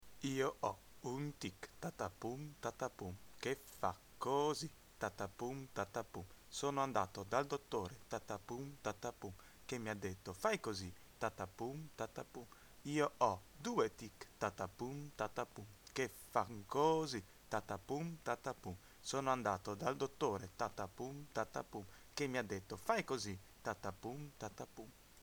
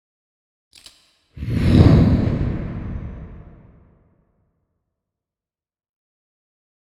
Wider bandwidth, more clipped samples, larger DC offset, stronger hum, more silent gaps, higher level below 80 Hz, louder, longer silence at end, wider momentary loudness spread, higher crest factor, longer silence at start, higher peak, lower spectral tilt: first, over 20 kHz vs 11.5 kHz; neither; neither; neither; neither; second, -70 dBFS vs -32 dBFS; second, -43 LUFS vs -17 LUFS; second, 0 s vs 3.6 s; second, 12 LU vs 23 LU; about the same, 24 dB vs 22 dB; second, 0 s vs 1.35 s; second, -20 dBFS vs 0 dBFS; second, -4.5 dB/octave vs -9 dB/octave